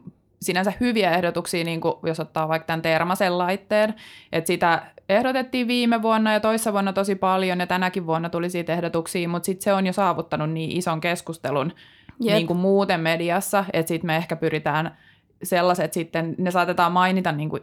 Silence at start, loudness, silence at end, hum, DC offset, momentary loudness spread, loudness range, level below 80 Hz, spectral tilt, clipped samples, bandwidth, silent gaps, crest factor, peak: 0.05 s; -23 LUFS; 0 s; none; under 0.1%; 6 LU; 3 LU; -60 dBFS; -5 dB/octave; under 0.1%; 18.5 kHz; none; 16 dB; -6 dBFS